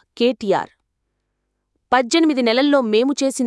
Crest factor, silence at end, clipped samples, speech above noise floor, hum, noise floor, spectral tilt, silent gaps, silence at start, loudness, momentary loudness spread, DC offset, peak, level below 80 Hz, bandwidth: 16 dB; 0 s; under 0.1%; 57 dB; none; -73 dBFS; -3.5 dB/octave; none; 0.15 s; -17 LUFS; 6 LU; under 0.1%; -4 dBFS; -64 dBFS; 12 kHz